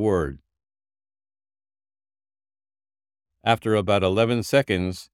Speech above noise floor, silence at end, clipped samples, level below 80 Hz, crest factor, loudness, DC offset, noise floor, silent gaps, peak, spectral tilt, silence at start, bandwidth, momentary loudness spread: over 68 dB; 0.1 s; under 0.1%; -52 dBFS; 22 dB; -22 LUFS; under 0.1%; under -90 dBFS; none; -4 dBFS; -6 dB/octave; 0 s; 16.5 kHz; 6 LU